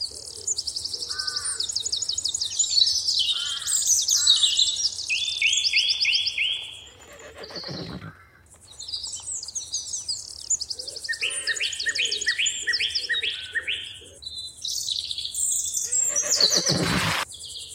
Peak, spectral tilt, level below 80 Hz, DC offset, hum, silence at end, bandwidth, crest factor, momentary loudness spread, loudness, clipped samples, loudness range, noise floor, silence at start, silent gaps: -6 dBFS; 0 dB/octave; -56 dBFS; under 0.1%; none; 0 s; 16 kHz; 20 dB; 15 LU; -23 LUFS; under 0.1%; 10 LU; -52 dBFS; 0 s; none